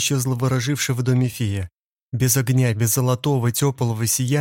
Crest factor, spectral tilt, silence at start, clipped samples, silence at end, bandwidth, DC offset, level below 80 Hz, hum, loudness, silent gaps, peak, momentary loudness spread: 14 dB; -5 dB/octave; 0 s; under 0.1%; 0 s; 17 kHz; under 0.1%; -52 dBFS; none; -20 LUFS; 1.73-2.10 s; -6 dBFS; 7 LU